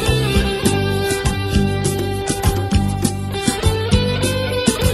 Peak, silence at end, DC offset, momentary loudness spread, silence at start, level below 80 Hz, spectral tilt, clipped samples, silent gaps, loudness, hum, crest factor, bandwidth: 0 dBFS; 0 s; under 0.1%; 4 LU; 0 s; -26 dBFS; -5 dB/octave; under 0.1%; none; -18 LUFS; none; 16 dB; 15.5 kHz